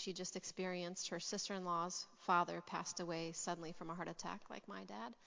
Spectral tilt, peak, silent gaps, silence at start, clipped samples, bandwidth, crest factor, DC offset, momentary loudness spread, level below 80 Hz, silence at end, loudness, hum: -3.5 dB/octave; -22 dBFS; none; 0 s; under 0.1%; 7.8 kHz; 22 dB; under 0.1%; 12 LU; -80 dBFS; 0 s; -44 LUFS; none